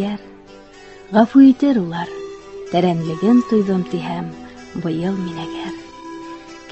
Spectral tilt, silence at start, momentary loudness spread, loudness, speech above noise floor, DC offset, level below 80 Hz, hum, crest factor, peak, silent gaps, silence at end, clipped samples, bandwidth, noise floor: -7.5 dB/octave; 0 s; 22 LU; -17 LUFS; 25 dB; 0.1%; -54 dBFS; none; 18 dB; 0 dBFS; none; 0 s; under 0.1%; 8.2 kHz; -41 dBFS